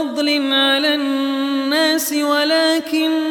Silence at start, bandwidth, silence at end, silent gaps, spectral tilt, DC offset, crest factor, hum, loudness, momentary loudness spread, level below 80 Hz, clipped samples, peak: 0 s; 19 kHz; 0 s; none; -1 dB/octave; under 0.1%; 12 dB; none; -16 LUFS; 5 LU; -70 dBFS; under 0.1%; -4 dBFS